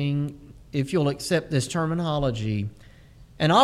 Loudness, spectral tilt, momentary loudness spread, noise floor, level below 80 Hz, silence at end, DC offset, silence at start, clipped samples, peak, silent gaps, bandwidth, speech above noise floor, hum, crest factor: -26 LUFS; -5.5 dB/octave; 8 LU; -49 dBFS; -48 dBFS; 0 s; under 0.1%; 0 s; under 0.1%; -4 dBFS; none; 14 kHz; 24 dB; none; 22 dB